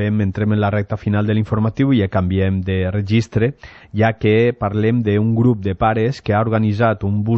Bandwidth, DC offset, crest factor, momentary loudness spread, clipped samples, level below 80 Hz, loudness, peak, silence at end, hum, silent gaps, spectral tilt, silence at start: 7 kHz; under 0.1%; 14 dB; 4 LU; under 0.1%; -42 dBFS; -17 LUFS; -4 dBFS; 0 s; none; none; -8.5 dB/octave; 0 s